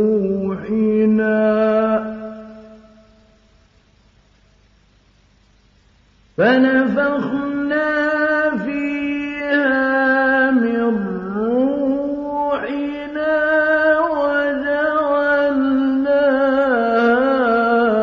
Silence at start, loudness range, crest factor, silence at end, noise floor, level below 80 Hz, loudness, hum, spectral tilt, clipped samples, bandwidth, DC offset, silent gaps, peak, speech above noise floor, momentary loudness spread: 0 s; 5 LU; 14 dB; 0 s; -54 dBFS; -52 dBFS; -17 LUFS; none; -8 dB/octave; under 0.1%; 6.2 kHz; under 0.1%; none; -4 dBFS; 39 dB; 8 LU